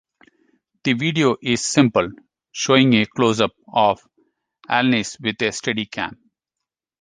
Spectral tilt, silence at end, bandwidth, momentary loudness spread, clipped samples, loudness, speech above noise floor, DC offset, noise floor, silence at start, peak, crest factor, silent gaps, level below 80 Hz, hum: -4.5 dB/octave; 0.85 s; 10 kHz; 11 LU; under 0.1%; -19 LUFS; 66 dB; under 0.1%; -85 dBFS; 0.85 s; -2 dBFS; 18 dB; none; -58 dBFS; none